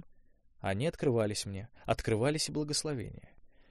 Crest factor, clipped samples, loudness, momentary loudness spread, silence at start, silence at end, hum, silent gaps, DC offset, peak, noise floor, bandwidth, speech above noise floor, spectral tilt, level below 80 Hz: 18 dB; under 0.1%; -33 LUFS; 11 LU; 0 s; 0.1 s; none; none; under 0.1%; -16 dBFS; -61 dBFS; 14 kHz; 28 dB; -4.5 dB/octave; -54 dBFS